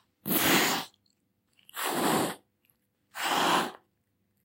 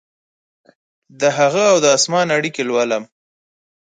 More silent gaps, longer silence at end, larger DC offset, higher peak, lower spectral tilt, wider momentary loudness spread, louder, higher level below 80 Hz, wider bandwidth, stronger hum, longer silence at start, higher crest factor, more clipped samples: neither; second, 0.7 s vs 0.95 s; neither; second, -10 dBFS vs -2 dBFS; about the same, -2.5 dB/octave vs -3 dB/octave; first, 20 LU vs 7 LU; second, -27 LUFS vs -16 LUFS; about the same, -68 dBFS vs -68 dBFS; first, 16 kHz vs 9.6 kHz; neither; second, 0.25 s vs 1.2 s; about the same, 22 dB vs 18 dB; neither